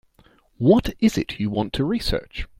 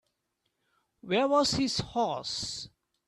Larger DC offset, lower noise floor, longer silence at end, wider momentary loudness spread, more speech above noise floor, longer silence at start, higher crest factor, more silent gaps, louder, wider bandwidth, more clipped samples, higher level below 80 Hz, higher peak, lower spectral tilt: neither; second, -57 dBFS vs -80 dBFS; second, 0.15 s vs 0.4 s; second, 8 LU vs 12 LU; second, 36 dB vs 51 dB; second, 0.6 s vs 1.05 s; about the same, 18 dB vs 16 dB; neither; first, -22 LUFS vs -29 LUFS; first, 16 kHz vs 13 kHz; neither; first, -36 dBFS vs -58 dBFS; first, -4 dBFS vs -14 dBFS; first, -6.5 dB/octave vs -4 dB/octave